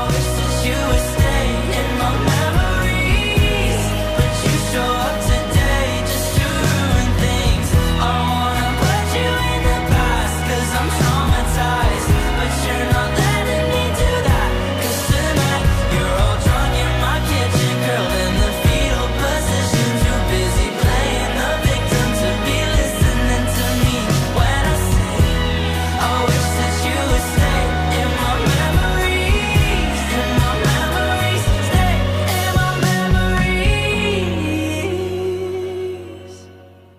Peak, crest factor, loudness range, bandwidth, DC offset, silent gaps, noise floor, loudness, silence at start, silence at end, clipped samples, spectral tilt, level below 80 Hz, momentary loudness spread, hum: -4 dBFS; 12 dB; 1 LU; 15.5 kHz; under 0.1%; none; -42 dBFS; -17 LUFS; 0 s; 0.35 s; under 0.1%; -5 dB/octave; -22 dBFS; 3 LU; none